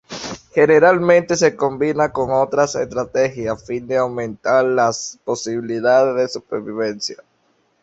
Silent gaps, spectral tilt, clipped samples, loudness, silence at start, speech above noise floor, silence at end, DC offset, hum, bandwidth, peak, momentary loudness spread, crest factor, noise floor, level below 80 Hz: none; -4.5 dB/octave; under 0.1%; -18 LUFS; 0.1 s; 45 dB; 0.7 s; under 0.1%; none; 8 kHz; -2 dBFS; 13 LU; 16 dB; -62 dBFS; -54 dBFS